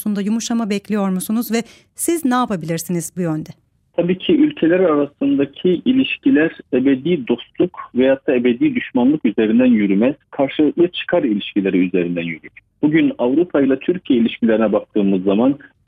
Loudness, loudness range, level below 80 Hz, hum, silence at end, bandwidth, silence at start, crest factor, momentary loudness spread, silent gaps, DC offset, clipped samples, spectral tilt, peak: -17 LUFS; 4 LU; -58 dBFS; none; 0.3 s; 16 kHz; 0 s; 14 dB; 7 LU; none; under 0.1%; under 0.1%; -6 dB/octave; -4 dBFS